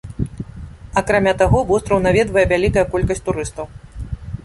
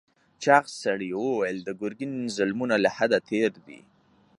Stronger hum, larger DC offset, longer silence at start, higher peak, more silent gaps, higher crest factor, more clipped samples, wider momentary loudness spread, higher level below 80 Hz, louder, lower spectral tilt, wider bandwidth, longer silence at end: neither; neither; second, 0.05 s vs 0.4 s; about the same, -2 dBFS vs -4 dBFS; neither; second, 16 dB vs 22 dB; neither; first, 18 LU vs 11 LU; first, -30 dBFS vs -70 dBFS; first, -17 LUFS vs -26 LUFS; about the same, -6 dB/octave vs -5 dB/octave; about the same, 11.5 kHz vs 11.5 kHz; second, 0.05 s vs 0.6 s